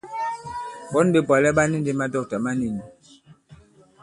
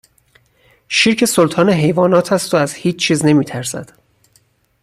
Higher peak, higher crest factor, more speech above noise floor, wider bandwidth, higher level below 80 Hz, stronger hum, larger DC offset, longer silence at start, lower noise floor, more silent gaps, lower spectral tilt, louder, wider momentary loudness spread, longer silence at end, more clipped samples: second, -4 dBFS vs 0 dBFS; about the same, 20 dB vs 16 dB; second, 31 dB vs 43 dB; second, 11.5 kHz vs 15.5 kHz; about the same, -54 dBFS vs -54 dBFS; neither; neither; second, 0.05 s vs 0.9 s; second, -52 dBFS vs -57 dBFS; neither; first, -6 dB/octave vs -4.5 dB/octave; second, -22 LUFS vs -14 LUFS; first, 15 LU vs 9 LU; second, 0.45 s vs 1 s; neither